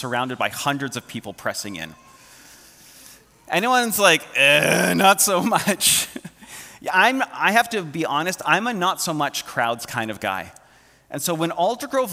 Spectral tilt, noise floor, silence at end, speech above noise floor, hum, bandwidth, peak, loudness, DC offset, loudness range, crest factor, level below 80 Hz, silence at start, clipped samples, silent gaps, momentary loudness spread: -2.5 dB/octave; -54 dBFS; 0 s; 33 dB; none; 16.5 kHz; 0 dBFS; -20 LUFS; under 0.1%; 9 LU; 22 dB; -62 dBFS; 0 s; under 0.1%; none; 16 LU